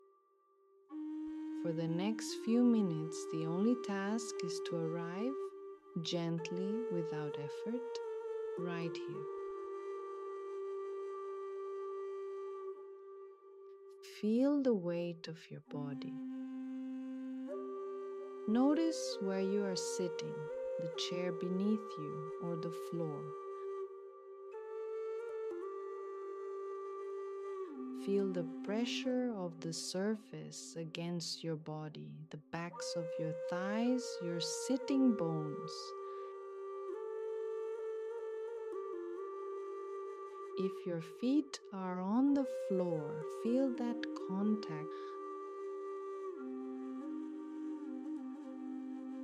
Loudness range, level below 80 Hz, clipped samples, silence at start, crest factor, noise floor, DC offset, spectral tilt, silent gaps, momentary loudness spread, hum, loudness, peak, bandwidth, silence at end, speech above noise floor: 8 LU; -86 dBFS; under 0.1%; 0.9 s; 18 dB; -72 dBFS; under 0.1%; -5.5 dB/octave; none; 11 LU; none; -40 LUFS; -22 dBFS; 13.5 kHz; 0 s; 34 dB